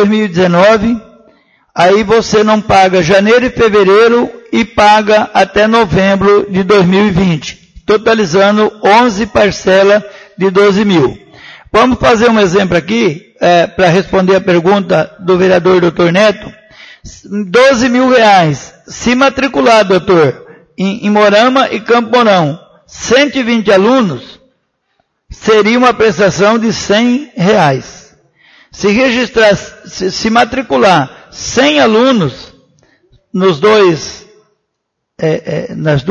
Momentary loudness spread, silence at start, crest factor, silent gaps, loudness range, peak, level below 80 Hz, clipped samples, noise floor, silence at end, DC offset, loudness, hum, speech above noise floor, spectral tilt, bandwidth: 10 LU; 0 s; 10 dB; none; 3 LU; 0 dBFS; -38 dBFS; 0.2%; -70 dBFS; 0 s; under 0.1%; -9 LUFS; none; 62 dB; -5 dB/octave; 10 kHz